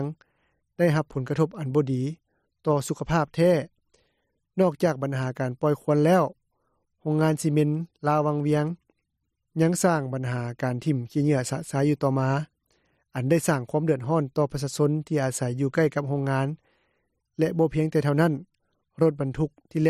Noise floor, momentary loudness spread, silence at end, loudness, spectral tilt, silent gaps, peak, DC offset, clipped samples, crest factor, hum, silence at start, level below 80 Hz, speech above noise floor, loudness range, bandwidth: -79 dBFS; 9 LU; 0 s; -25 LUFS; -7 dB/octave; none; -10 dBFS; under 0.1%; under 0.1%; 16 dB; none; 0 s; -58 dBFS; 55 dB; 2 LU; 14.5 kHz